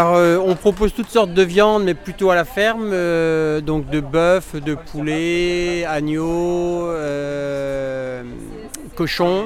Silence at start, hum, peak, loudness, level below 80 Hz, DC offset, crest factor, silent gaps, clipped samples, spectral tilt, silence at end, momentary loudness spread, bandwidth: 0 s; none; -2 dBFS; -18 LUFS; -38 dBFS; under 0.1%; 16 dB; none; under 0.1%; -5.5 dB/octave; 0 s; 11 LU; 16 kHz